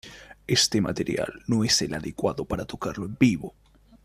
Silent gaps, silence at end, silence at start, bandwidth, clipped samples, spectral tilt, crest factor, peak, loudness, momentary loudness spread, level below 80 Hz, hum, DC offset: none; 0.55 s; 0.05 s; 15 kHz; under 0.1%; -4 dB/octave; 20 dB; -6 dBFS; -25 LUFS; 11 LU; -50 dBFS; none; under 0.1%